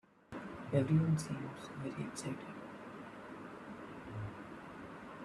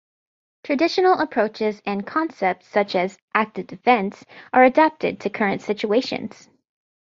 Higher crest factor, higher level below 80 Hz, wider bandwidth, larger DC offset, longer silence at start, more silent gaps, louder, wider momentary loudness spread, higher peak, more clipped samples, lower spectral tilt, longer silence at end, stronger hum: about the same, 22 dB vs 20 dB; about the same, -68 dBFS vs -66 dBFS; first, 12.5 kHz vs 7.6 kHz; neither; second, 0.3 s vs 0.65 s; second, none vs 3.22-3.28 s; second, -41 LUFS vs -21 LUFS; first, 18 LU vs 11 LU; second, -18 dBFS vs -2 dBFS; neither; first, -7 dB/octave vs -5.5 dB/octave; second, 0 s vs 0.75 s; neither